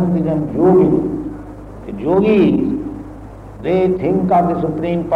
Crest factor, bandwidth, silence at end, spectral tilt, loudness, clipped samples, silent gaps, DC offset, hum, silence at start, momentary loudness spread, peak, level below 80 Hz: 14 dB; 5.4 kHz; 0 s; -10 dB/octave; -15 LUFS; under 0.1%; none; under 0.1%; none; 0 s; 20 LU; -2 dBFS; -38 dBFS